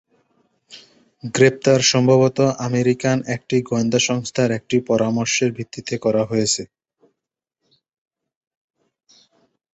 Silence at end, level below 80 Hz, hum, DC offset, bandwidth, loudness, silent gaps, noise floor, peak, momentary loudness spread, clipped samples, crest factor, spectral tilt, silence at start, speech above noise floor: 3.1 s; -58 dBFS; none; under 0.1%; 8.2 kHz; -18 LUFS; none; -83 dBFS; -2 dBFS; 9 LU; under 0.1%; 18 dB; -4.5 dB/octave; 0.7 s; 65 dB